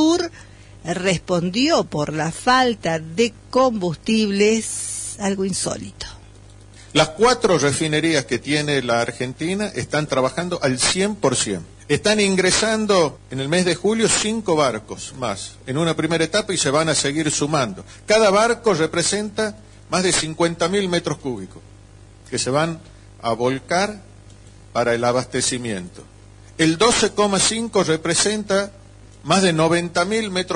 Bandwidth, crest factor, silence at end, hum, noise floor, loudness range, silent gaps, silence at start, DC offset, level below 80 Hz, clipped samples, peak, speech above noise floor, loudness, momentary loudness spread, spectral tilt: 12.5 kHz; 16 dB; 0 s; none; -44 dBFS; 4 LU; none; 0 s; under 0.1%; -48 dBFS; under 0.1%; -4 dBFS; 25 dB; -19 LUFS; 11 LU; -3.5 dB/octave